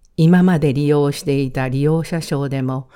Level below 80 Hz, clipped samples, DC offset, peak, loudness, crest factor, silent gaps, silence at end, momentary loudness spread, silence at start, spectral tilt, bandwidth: -44 dBFS; under 0.1%; under 0.1%; -2 dBFS; -17 LUFS; 14 dB; none; 0.15 s; 8 LU; 0.2 s; -7.5 dB/octave; 15.5 kHz